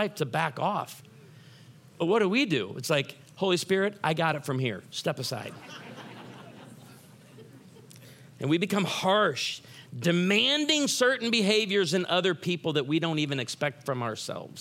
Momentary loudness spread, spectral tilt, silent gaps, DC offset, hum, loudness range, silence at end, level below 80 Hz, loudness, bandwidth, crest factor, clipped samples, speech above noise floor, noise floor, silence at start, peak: 18 LU; -4 dB/octave; none; under 0.1%; none; 11 LU; 0 s; -78 dBFS; -27 LUFS; 16.5 kHz; 20 dB; under 0.1%; 25 dB; -52 dBFS; 0 s; -8 dBFS